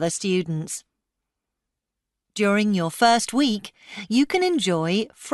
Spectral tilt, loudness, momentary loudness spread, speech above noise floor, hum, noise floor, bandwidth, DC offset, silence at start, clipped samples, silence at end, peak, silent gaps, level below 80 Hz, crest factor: -4.5 dB/octave; -22 LUFS; 14 LU; 62 dB; none; -84 dBFS; 12 kHz; under 0.1%; 0 s; under 0.1%; 0 s; -6 dBFS; none; -66 dBFS; 18 dB